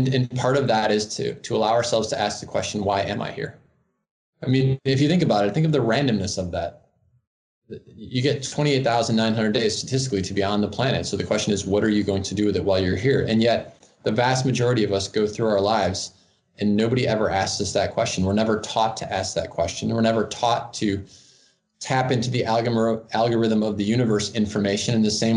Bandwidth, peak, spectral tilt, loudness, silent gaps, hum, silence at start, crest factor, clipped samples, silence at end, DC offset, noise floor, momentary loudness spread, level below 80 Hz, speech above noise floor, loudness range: 10.5 kHz; -6 dBFS; -5 dB/octave; -22 LUFS; 4.11-4.33 s, 7.27-7.62 s; none; 0 s; 16 dB; under 0.1%; 0 s; under 0.1%; -60 dBFS; 7 LU; -58 dBFS; 38 dB; 3 LU